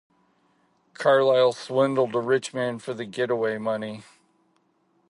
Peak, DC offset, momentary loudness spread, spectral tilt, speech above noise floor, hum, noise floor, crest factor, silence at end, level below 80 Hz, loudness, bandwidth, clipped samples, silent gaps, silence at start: -6 dBFS; under 0.1%; 13 LU; -5 dB/octave; 44 dB; none; -67 dBFS; 18 dB; 1.1 s; -76 dBFS; -24 LUFS; 11 kHz; under 0.1%; none; 1 s